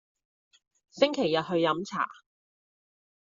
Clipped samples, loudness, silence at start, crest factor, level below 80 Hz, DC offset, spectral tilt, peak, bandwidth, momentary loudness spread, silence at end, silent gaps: under 0.1%; -28 LUFS; 0.95 s; 24 dB; -76 dBFS; under 0.1%; -3 dB/octave; -8 dBFS; 7.8 kHz; 7 LU; 1.1 s; none